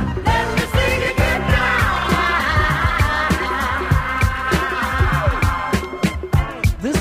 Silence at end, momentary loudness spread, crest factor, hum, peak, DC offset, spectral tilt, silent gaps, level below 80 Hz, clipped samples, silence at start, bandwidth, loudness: 0 s; 4 LU; 14 dB; none; -2 dBFS; under 0.1%; -5.5 dB/octave; none; -26 dBFS; under 0.1%; 0 s; 16 kHz; -18 LUFS